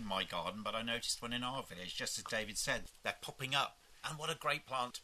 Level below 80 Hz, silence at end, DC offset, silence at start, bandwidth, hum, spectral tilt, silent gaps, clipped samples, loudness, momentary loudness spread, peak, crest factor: -62 dBFS; 0 s; under 0.1%; 0 s; 13.5 kHz; none; -2 dB/octave; none; under 0.1%; -39 LUFS; 7 LU; -18 dBFS; 24 dB